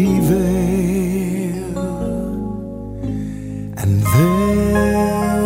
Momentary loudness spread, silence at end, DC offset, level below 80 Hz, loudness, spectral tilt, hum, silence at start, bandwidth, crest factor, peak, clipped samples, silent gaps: 12 LU; 0 s; under 0.1%; -32 dBFS; -18 LUFS; -7 dB/octave; none; 0 s; 16.5 kHz; 16 dB; -2 dBFS; under 0.1%; none